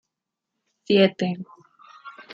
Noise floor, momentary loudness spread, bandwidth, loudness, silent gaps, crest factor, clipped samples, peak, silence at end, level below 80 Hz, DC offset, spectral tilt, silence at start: -84 dBFS; 24 LU; 7.2 kHz; -21 LUFS; none; 22 dB; under 0.1%; -4 dBFS; 0.1 s; -70 dBFS; under 0.1%; -7 dB/octave; 0.9 s